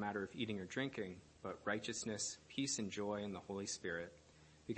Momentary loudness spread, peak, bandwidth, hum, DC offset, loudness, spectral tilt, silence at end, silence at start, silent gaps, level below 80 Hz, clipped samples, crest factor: 9 LU; -26 dBFS; 8.8 kHz; none; under 0.1%; -44 LUFS; -3.5 dB/octave; 0 s; 0 s; none; -74 dBFS; under 0.1%; 20 dB